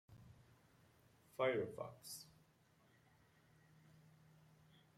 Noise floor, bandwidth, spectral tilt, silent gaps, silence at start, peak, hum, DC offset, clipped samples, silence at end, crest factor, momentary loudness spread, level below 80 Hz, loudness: -74 dBFS; 16 kHz; -4.5 dB/octave; none; 0.1 s; -28 dBFS; none; under 0.1%; under 0.1%; 2.7 s; 22 dB; 25 LU; -82 dBFS; -45 LUFS